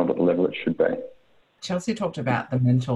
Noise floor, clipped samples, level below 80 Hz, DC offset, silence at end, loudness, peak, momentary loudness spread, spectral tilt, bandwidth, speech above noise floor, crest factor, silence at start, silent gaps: -59 dBFS; under 0.1%; -60 dBFS; under 0.1%; 0 s; -24 LUFS; -8 dBFS; 11 LU; -7 dB/octave; 10 kHz; 35 dB; 16 dB; 0 s; none